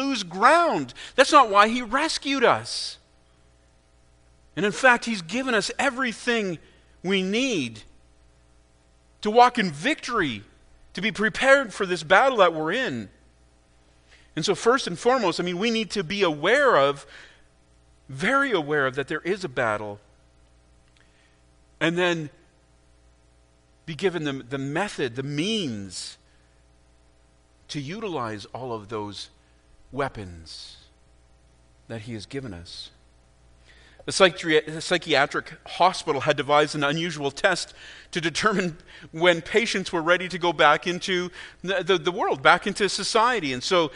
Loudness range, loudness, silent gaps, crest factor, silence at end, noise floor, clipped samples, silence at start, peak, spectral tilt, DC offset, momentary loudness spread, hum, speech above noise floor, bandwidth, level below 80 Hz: 13 LU; -23 LUFS; none; 24 dB; 0 s; -59 dBFS; under 0.1%; 0 s; 0 dBFS; -4 dB/octave; under 0.1%; 18 LU; 60 Hz at -60 dBFS; 36 dB; 10.5 kHz; -56 dBFS